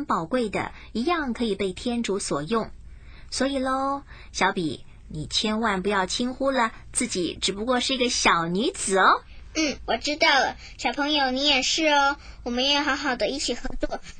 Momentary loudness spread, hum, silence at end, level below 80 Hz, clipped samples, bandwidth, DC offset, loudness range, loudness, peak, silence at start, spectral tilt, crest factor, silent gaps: 11 LU; none; 0 s; -44 dBFS; under 0.1%; 10.5 kHz; under 0.1%; 6 LU; -24 LUFS; -6 dBFS; 0 s; -2.5 dB/octave; 18 dB; none